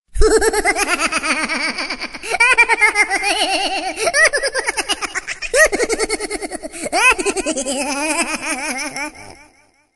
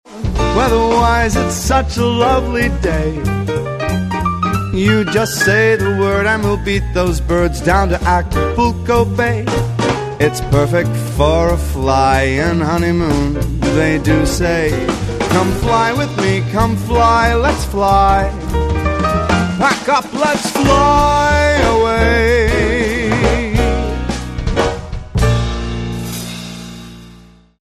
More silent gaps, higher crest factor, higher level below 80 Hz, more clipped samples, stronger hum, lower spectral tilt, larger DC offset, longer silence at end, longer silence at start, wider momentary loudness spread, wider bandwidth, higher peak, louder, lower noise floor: neither; about the same, 18 dB vs 14 dB; second, -32 dBFS vs -22 dBFS; neither; neither; second, -1.5 dB/octave vs -5.5 dB/octave; neither; about the same, 0.6 s vs 0.5 s; about the same, 0.15 s vs 0.1 s; first, 11 LU vs 7 LU; about the same, 13 kHz vs 14 kHz; about the same, 0 dBFS vs 0 dBFS; about the same, -16 LUFS vs -14 LUFS; first, -53 dBFS vs -42 dBFS